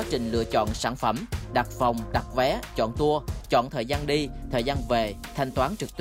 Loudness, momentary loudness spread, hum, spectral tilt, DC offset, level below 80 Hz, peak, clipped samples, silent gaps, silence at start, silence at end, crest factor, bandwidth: -27 LUFS; 4 LU; none; -5.5 dB/octave; under 0.1%; -38 dBFS; -10 dBFS; under 0.1%; none; 0 s; 0 s; 16 dB; 16 kHz